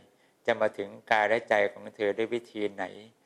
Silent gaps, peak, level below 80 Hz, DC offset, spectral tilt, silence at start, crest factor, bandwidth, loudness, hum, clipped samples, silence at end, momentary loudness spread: none; -8 dBFS; -76 dBFS; under 0.1%; -4.5 dB/octave; 0.45 s; 22 dB; 12 kHz; -29 LUFS; none; under 0.1%; 0.2 s; 11 LU